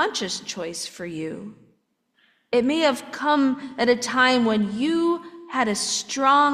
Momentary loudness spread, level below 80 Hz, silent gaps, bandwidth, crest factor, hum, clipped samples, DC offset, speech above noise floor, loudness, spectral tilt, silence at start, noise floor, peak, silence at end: 13 LU; -66 dBFS; none; 14.5 kHz; 18 dB; none; under 0.1%; under 0.1%; 45 dB; -22 LUFS; -3 dB/octave; 0 s; -68 dBFS; -6 dBFS; 0 s